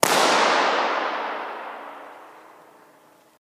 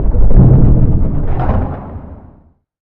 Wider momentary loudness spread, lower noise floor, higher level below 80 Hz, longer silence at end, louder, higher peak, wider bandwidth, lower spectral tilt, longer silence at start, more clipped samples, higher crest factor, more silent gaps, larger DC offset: first, 22 LU vs 19 LU; first, -55 dBFS vs -47 dBFS; second, -72 dBFS vs -14 dBFS; first, 1.1 s vs 0.05 s; second, -21 LUFS vs -12 LUFS; about the same, 0 dBFS vs 0 dBFS; first, 15.5 kHz vs 2.6 kHz; second, -1.5 dB/octave vs -13 dB/octave; about the same, 0 s vs 0 s; second, under 0.1% vs 1%; first, 24 dB vs 10 dB; neither; neither